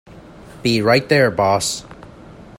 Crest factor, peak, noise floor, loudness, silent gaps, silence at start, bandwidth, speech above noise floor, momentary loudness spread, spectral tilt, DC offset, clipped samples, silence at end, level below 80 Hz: 18 dB; 0 dBFS; -40 dBFS; -16 LUFS; none; 0.15 s; 16.5 kHz; 24 dB; 9 LU; -4.5 dB/octave; under 0.1%; under 0.1%; 0.15 s; -50 dBFS